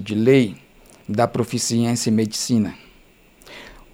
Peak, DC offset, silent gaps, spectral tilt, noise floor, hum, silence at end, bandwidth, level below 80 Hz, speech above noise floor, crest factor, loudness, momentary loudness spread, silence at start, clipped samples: -4 dBFS; under 0.1%; none; -5 dB/octave; -52 dBFS; none; 0.2 s; 16.5 kHz; -54 dBFS; 33 dB; 18 dB; -20 LUFS; 23 LU; 0 s; under 0.1%